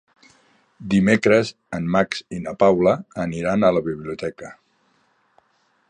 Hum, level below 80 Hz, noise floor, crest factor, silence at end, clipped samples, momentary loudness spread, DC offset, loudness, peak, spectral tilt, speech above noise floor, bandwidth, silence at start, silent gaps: none; -52 dBFS; -64 dBFS; 20 dB; 1.35 s; under 0.1%; 15 LU; under 0.1%; -20 LUFS; -2 dBFS; -6.5 dB/octave; 44 dB; 10 kHz; 0.8 s; none